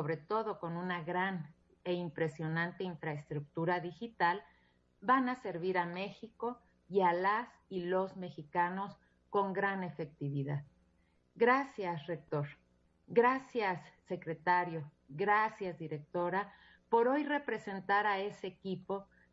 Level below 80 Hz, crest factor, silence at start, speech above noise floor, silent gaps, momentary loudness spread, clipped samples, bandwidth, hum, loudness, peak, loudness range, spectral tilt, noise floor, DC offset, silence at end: -76 dBFS; 20 dB; 0 s; 37 dB; none; 13 LU; under 0.1%; 7.6 kHz; none; -36 LUFS; -16 dBFS; 3 LU; -4.5 dB/octave; -72 dBFS; under 0.1%; 0.3 s